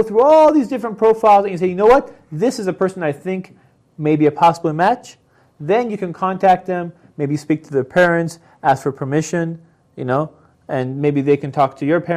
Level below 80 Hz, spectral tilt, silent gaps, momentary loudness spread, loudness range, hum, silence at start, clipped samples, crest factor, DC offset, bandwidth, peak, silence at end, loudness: -52 dBFS; -7 dB/octave; none; 13 LU; 4 LU; none; 0 s; under 0.1%; 14 dB; under 0.1%; 14 kHz; -2 dBFS; 0 s; -17 LUFS